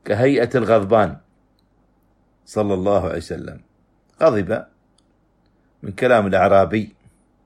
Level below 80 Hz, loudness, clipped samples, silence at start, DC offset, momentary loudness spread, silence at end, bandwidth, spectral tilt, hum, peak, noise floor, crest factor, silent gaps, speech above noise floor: -50 dBFS; -18 LUFS; under 0.1%; 0.05 s; under 0.1%; 18 LU; 0.6 s; 12 kHz; -7 dB/octave; none; -2 dBFS; -60 dBFS; 18 dB; none; 43 dB